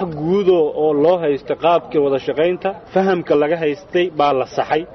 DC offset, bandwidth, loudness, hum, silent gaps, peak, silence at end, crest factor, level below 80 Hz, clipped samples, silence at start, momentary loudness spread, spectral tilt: under 0.1%; 6.2 kHz; -17 LUFS; none; none; -4 dBFS; 0 s; 12 dB; -52 dBFS; under 0.1%; 0 s; 5 LU; -7 dB/octave